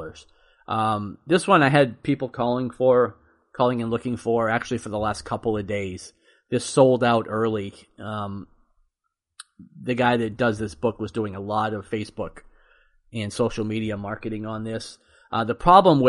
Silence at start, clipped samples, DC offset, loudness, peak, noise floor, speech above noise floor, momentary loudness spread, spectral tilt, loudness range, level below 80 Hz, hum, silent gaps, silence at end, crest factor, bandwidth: 0 s; under 0.1%; under 0.1%; -23 LUFS; 0 dBFS; -80 dBFS; 58 dB; 16 LU; -6 dB/octave; 7 LU; -50 dBFS; none; none; 0 s; 22 dB; 11.5 kHz